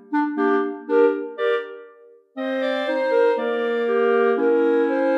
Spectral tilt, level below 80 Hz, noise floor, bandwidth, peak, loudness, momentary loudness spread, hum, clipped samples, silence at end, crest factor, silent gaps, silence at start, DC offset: -5.5 dB/octave; -80 dBFS; -49 dBFS; 5.8 kHz; -8 dBFS; -21 LUFS; 7 LU; none; under 0.1%; 0 s; 14 dB; none; 0.1 s; under 0.1%